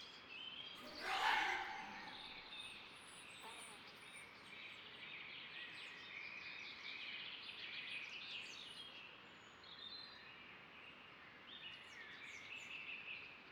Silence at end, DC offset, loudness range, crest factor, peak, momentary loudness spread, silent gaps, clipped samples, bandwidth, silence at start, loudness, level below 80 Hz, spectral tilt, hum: 0 s; under 0.1%; 10 LU; 24 dB; -26 dBFS; 12 LU; none; under 0.1%; 19 kHz; 0 s; -49 LUFS; -80 dBFS; -1 dB/octave; none